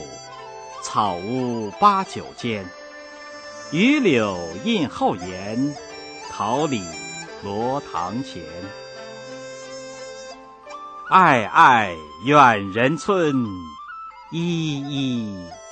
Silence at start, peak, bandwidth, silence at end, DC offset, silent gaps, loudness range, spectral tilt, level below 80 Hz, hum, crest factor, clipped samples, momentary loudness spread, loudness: 0 s; -2 dBFS; 9 kHz; 0 s; under 0.1%; none; 13 LU; -5 dB/octave; -58 dBFS; none; 20 dB; under 0.1%; 22 LU; -20 LUFS